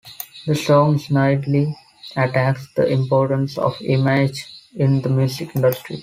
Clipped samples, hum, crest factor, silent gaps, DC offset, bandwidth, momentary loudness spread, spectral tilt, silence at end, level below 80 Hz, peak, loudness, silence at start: under 0.1%; none; 16 dB; none; under 0.1%; 16 kHz; 11 LU; -7 dB/octave; 0 s; -56 dBFS; -4 dBFS; -19 LUFS; 0.05 s